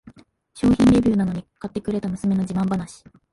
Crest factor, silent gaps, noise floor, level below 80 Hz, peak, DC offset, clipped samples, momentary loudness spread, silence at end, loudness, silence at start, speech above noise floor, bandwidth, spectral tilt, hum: 14 dB; none; -50 dBFS; -42 dBFS; -6 dBFS; under 0.1%; under 0.1%; 15 LU; 0.4 s; -21 LUFS; 0.05 s; 29 dB; 11.5 kHz; -7.5 dB/octave; none